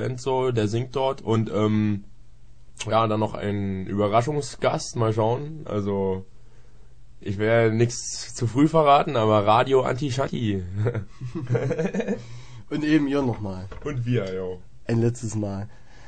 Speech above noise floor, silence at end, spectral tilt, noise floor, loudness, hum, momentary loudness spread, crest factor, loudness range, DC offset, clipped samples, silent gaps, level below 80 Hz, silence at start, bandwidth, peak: 27 dB; 0 s; -6.5 dB/octave; -50 dBFS; -24 LUFS; none; 14 LU; 18 dB; 6 LU; 0.9%; under 0.1%; none; -50 dBFS; 0 s; 9.4 kHz; -4 dBFS